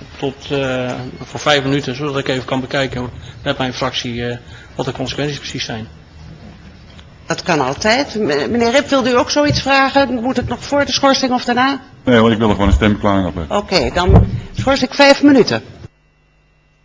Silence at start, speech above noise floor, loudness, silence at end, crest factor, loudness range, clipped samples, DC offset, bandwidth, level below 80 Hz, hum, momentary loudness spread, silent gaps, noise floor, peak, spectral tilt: 0 s; 39 dB; -15 LUFS; 1 s; 16 dB; 9 LU; under 0.1%; under 0.1%; 8 kHz; -28 dBFS; none; 12 LU; none; -54 dBFS; 0 dBFS; -5 dB/octave